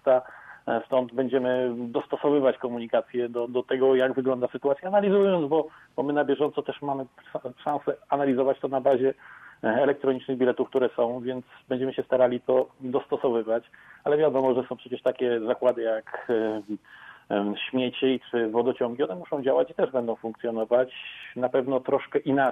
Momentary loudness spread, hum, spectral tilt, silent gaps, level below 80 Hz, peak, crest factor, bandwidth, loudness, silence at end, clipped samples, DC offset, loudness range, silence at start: 9 LU; none; -8 dB/octave; none; -70 dBFS; -10 dBFS; 16 dB; 3.9 kHz; -26 LUFS; 0 s; under 0.1%; under 0.1%; 3 LU; 0.05 s